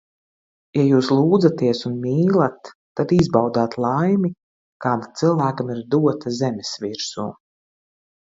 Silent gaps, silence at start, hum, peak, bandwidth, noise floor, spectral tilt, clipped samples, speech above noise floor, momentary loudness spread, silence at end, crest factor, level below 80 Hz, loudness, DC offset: 2.75-2.95 s, 4.43-4.80 s; 0.75 s; none; -2 dBFS; 7.8 kHz; under -90 dBFS; -7 dB/octave; under 0.1%; over 71 dB; 11 LU; 1 s; 18 dB; -54 dBFS; -20 LUFS; under 0.1%